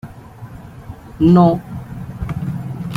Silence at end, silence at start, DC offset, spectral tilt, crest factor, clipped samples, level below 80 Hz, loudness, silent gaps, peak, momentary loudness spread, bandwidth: 0 s; 0.05 s; under 0.1%; -9.5 dB/octave; 16 dB; under 0.1%; -38 dBFS; -16 LUFS; none; -2 dBFS; 25 LU; 4.9 kHz